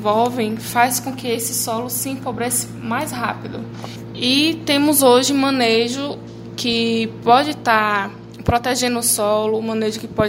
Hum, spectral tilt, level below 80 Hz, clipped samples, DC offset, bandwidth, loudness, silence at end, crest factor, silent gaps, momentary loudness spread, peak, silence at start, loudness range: none; -3 dB/octave; -46 dBFS; under 0.1%; under 0.1%; 16.5 kHz; -18 LUFS; 0 s; 18 dB; none; 11 LU; 0 dBFS; 0 s; 5 LU